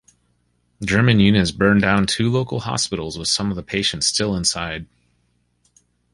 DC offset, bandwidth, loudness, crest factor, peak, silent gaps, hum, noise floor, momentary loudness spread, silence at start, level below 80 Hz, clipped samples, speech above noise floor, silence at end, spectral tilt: under 0.1%; 11.5 kHz; -19 LUFS; 18 dB; -2 dBFS; none; 60 Hz at -45 dBFS; -65 dBFS; 9 LU; 0.8 s; -42 dBFS; under 0.1%; 47 dB; 1.3 s; -4.5 dB/octave